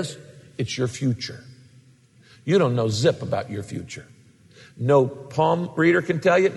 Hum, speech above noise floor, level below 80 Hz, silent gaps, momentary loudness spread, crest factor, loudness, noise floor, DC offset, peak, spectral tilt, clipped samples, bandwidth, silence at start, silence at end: none; 32 dB; -62 dBFS; none; 17 LU; 18 dB; -23 LUFS; -54 dBFS; under 0.1%; -6 dBFS; -6 dB/octave; under 0.1%; 12 kHz; 0 s; 0 s